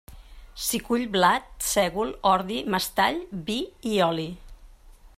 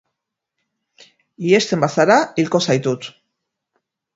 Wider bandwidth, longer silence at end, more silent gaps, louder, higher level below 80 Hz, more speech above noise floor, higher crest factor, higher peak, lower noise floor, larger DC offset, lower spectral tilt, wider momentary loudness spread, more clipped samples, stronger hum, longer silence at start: first, 16 kHz vs 8 kHz; second, 0.1 s vs 1.05 s; neither; second, -25 LUFS vs -17 LUFS; first, -48 dBFS vs -62 dBFS; second, 25 dB vs 63 dB; about the same, 20 dB vs 20 dB; second, -6 dBFS vs 0 dBFS; second, -50 dBFS vs -80 dBFS; neither; second, -3.5 dB/octave vs -5 dB/octave; about the same, 10 LU vs 12 LU; neither; neither; second, 0.1 s vs 1.4 s